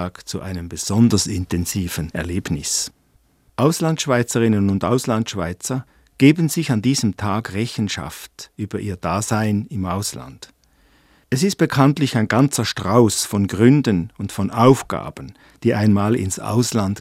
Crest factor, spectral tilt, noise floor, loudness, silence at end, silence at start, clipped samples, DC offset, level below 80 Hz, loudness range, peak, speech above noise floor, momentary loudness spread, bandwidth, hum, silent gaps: 20 dB; -5.5 dB/octave; -58 dBFS; -19 LUFS; 0 s; 0 s; under 0.1%; under 0.1%; -46 dBFS; 6 LU; 0 dBFS; 40 dB; 13 LU; 16 kHz; none; none